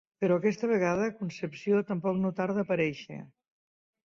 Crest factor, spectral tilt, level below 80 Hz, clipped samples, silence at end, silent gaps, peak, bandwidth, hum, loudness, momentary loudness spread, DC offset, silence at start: 16 dB; -7 dB/octave; -68 dBFS; under 0.1%; 0.8 s; none; -14 dBFS; 7.2 kHz; none; -29 LUFS; 9 LU; under 0.1%; 0.2 s